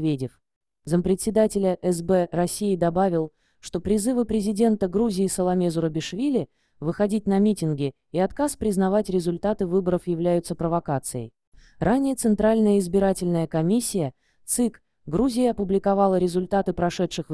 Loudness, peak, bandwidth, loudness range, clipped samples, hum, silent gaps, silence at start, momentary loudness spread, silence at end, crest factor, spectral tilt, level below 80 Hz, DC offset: -23 LUFS; -8 dBFS; 11 kHz; 2 LU; under 0.1%; none; 0.56-0.61 s, 11.47-11.52 s; 0 s; 8 LU; 0 s; 16 dB; -6 dB/octave; -48 dBFS; 0.3%